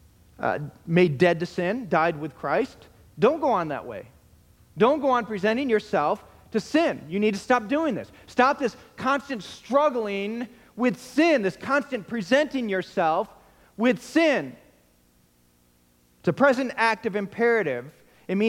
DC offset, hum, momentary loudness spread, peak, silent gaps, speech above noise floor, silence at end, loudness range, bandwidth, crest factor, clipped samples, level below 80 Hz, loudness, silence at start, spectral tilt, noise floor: under 0.1%; 60 Hz at -55 dBFS; 10 LU; -4 dBFS; none; 38 dB; 0 s; 2 LU; 16.5 kHz; 20 dB; under 0.1%; -62 dBFS; -24 LUFS; 0.4 s; -6 dB/octave; -62 dBFS